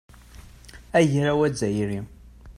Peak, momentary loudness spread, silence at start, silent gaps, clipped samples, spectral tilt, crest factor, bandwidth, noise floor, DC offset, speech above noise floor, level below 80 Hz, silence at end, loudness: -6 dBFS; 12 LU; 0.35 s; none; under 0.1%; -6 dB/octave; 20 dB; 14.5 kHz; -46 dBFS; under 0.1%; 24 dB; -48 dBFS; 0.05 s; -23 LUFS